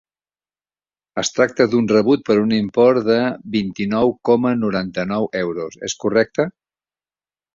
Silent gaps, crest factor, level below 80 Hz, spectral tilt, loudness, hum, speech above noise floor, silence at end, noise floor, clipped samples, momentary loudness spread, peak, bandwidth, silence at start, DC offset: none; 18 dB; -56 dBFS; -5 dB/octave; -18 LUFS; none; over 73 dB; 1.05 s; under -90 dBFS; under 0.1%; 9 LU; -2 dBFS; 7.6 kHz; 1.15 s; under 0.1%